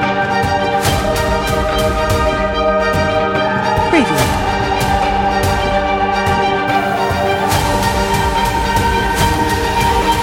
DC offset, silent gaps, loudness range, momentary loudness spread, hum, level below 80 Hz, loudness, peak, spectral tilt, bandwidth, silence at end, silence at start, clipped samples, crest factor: under 0.1%; none; 1 LU; 2 LU; none; -26 dBFS; -14 LUFS; 0 dBFS; -4.5 dB/octave; 17 kHz; 0 s; 0 s; under 0.1%; 14 dB